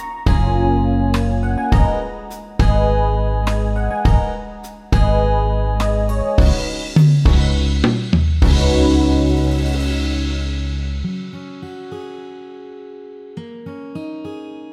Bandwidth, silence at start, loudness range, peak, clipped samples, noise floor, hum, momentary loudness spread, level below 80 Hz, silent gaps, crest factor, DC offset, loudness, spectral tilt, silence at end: 12 kHz; 0 s; 14 LU; 0 dBFS; under 0.1%; -35 dBFS; none; 19 LU; -20 dBFS; none; 16 dB; under 0.1%; -17 LUFS; -7 dB/octave; 0 s